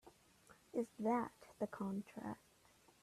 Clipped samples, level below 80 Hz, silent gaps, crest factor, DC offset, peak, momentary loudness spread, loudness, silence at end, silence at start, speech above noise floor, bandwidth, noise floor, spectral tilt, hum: under 0.1%; -80 dBFS; none; 18 dB; under 0.1%; -28 dBFS; 11 LU; -44 LUFS; 0.65 s; 0.05 s; 28 dB; 14 kHz; -70 dBFS; -7 dB/octave; none